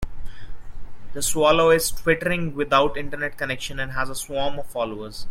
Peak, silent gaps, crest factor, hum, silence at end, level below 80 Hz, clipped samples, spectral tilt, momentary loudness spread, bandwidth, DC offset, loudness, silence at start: -4 dBFS; none; 18 dB; none; 0 s; -38 dBFS; under 0.1%; -3.5 dB/octave; 12 LU; 16.5 kHz; under 0.1%; -22 LUFS; 0 s